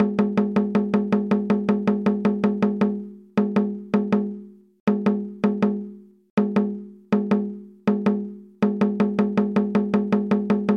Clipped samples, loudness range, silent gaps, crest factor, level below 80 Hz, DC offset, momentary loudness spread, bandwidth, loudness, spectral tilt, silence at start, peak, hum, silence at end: under 0.1%; 2 LU; 4.80-4.87 s, 6.30-6.37 s; 14 dB; -66 dBFS; under 0.1%; 6 LU; 6.2 kHz; -23 LUFS; -9 dB/octave; 0 s; -8 dBFS; none; 0 s